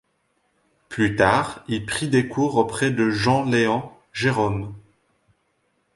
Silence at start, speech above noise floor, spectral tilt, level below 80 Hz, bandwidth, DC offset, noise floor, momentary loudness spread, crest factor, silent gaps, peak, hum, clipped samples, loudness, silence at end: 0.9 s; 48 dB; -5.5 dB/octave; -50 dBFS; 11.5 kHz; under 0.1%; -69 dBFS; 10 LU; 22 dB; none; -2 dBFS; none; under 0.1%; -21 LUFS; 1.15 s